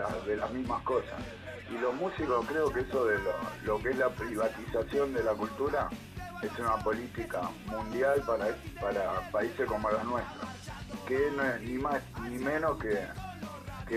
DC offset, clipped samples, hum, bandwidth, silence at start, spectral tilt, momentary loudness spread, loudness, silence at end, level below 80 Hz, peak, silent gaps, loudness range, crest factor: under 0.1%; under 0.1%; none; 15 kHz; 0 s; -6 dB/octave; 12 LU; -33 LUFS; 0 s; -50 dBFS; -16 dBFS; none; 2 LU; 16 dB